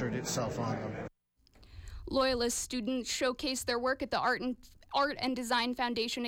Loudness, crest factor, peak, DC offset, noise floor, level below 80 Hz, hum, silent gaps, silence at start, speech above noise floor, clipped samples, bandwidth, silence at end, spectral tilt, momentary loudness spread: -33 LUFS; 14 dB; -18 dBFS; under 0.1%; -67 dBFS; -54 dBFS; none; none; 0 s; 34 dB; under 0.1%; 17 kHz; 0 s; -3.5 dB/octave; 12 LU